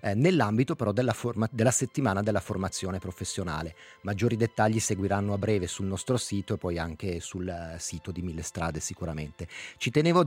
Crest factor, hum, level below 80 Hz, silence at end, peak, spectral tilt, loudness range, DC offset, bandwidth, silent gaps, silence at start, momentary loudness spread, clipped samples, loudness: 20 dB; none; -56 dBFS; 0 s; -10 dBFS; -5.5 dB/octave; 5 LU; under 0.1%; 16 kHz; none; 0 s; 11 LU; under 0.1%; -29 LUFS